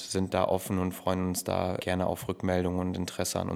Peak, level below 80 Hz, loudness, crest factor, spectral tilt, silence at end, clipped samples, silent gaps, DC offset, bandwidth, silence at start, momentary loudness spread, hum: -12 dBFS; -56 dBFS; -30 LUFS; 18 dB; -5 dB/octave; 0 s; under 0.1%; none; under 0.1%; 16.5 kHz; 0 s; 4 LU; none